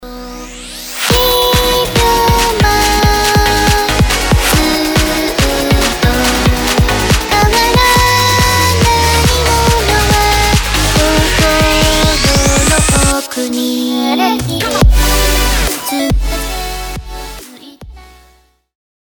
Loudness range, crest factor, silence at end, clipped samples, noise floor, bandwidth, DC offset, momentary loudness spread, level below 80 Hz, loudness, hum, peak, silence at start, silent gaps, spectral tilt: 5 LU; 12 dB; 1.15 s; under 0.1%; -49 dBFS; over 20 kHz; under 0.1%; 9 LU; -18 dBFS; -11 LUFS; none; 0 dBFS; 0 s; none; -3.5 dB/octave